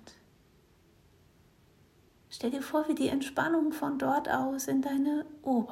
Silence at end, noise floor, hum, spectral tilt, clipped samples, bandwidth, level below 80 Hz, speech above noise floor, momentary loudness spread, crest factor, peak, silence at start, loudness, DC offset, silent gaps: 0 s; -63 dBFS; none; -4.5 dB/octave; under 0.1%; 16 kHz; -68 dBFS; 33 dB; 6 LU; 18 dB; -14 dBFS; 0.05 s; -31 LUFS; under 0.1%; none